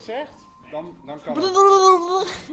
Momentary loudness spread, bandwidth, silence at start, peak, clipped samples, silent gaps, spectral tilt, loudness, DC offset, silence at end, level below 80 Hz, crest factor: 22 LU; 8.2 kHz; 0.1 s; 0 dBFS; under 0.1%; none; -3 dB/octave; -15 LUFS; under 0.1%; 0 s; -60 dBFS; 18 dB